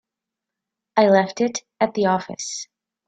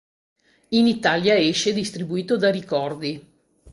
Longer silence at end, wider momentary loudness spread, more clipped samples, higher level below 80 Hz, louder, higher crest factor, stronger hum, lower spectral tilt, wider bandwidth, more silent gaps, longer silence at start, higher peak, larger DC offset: first, 0.45 s vs 0 s; first, 13 LU vs 10 LU; neither; second, -66 dBFS vs -60 dBFS; about the same, -21 LUFS vs -21 LUFS; about the same, 20 dB vs 20 dB; neither; about the same, -4.5 dB/octave vs -4.5 dB/octave; second, 9.2 kHz vs 11.5 kHz; neither; first, 0.95 s vs 0.7 s; about the same, -2 dBFS vs -4 dBFS; neither